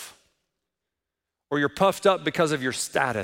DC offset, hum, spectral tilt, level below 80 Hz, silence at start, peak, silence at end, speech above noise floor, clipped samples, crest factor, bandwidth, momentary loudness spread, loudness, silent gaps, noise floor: under 0.1%; none; -4 dB/octave; -64 dBFS; 0 s; -6 dBFS; 0 s; 62 dB; under 0.1%; 20 dB; 16.5 kHz; 6 LU; -24 LUFS; none; -86 dBFS